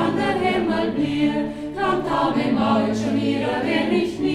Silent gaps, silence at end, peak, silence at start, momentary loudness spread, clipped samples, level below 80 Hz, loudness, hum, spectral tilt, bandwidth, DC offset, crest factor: none; 0 s; -8 dBFS; 0 s; 3 LU; under 0.1%; -48 dBFS; -21 LUFS; none; -6 dB/octave; 12 kHz; under 0.1%; 14 dB